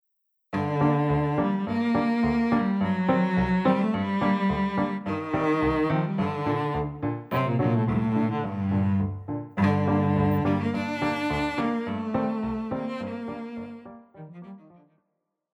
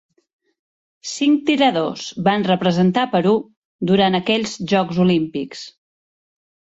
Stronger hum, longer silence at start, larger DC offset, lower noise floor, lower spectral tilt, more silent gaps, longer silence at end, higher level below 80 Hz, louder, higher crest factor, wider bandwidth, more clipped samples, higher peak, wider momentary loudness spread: neither; second, 0.5 s vs 1.05 s; neither; second, -79 dBFS vs under -90 dBFS; first, -8.5 dB/octave vs -5.5 dB/octave; second, none vs 3.57-3.79 s; about the same, 1 s vs 1.05 s; first, -48 dBFS vs -58 dBFS; second, -26 LUFS vs -18 LUFS; about the same, 16 dB vs 16 dB; first, 16 kHz vs 8 kHz; neither; second, -10 dBFS vs -4 dBFS; about the same, 11 LU vs 12 LU